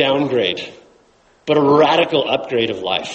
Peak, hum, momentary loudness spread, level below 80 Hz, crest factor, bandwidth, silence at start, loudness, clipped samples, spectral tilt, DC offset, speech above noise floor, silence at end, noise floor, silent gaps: -2 dBFS; none; 13 LU; -58 dBFS; 14 dB; 8.4 kHz; 0 s; -16 LUFS; under 0.1%; -5.5 dB/octave; under 0.1%; 38 dB; 0 s; -54 dBFS; none